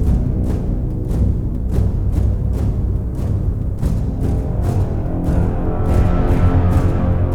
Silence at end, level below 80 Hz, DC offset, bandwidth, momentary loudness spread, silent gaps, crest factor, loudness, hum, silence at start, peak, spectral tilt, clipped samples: 0 s; -20 dBFS; under 0.1%; 11 kHz; 6 LU; none; 14 dB; -19 LUFS; none; 0 s; -2 dBFS; -9.5 dB/octave; under 0.1%